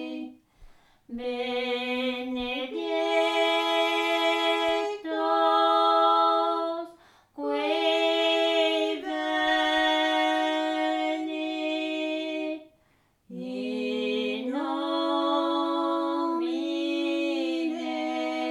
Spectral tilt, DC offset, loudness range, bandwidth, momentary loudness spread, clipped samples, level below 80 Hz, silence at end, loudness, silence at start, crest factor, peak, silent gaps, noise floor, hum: -3 dB/octave; under 0.1%; 7 LU; 12.5 kHz; 10 LU; under 0.1%; -64 dBFS; 0 s; -26 LUFS; 0 s; 16 dB; -12 dBFS; none; -66 dBFS; none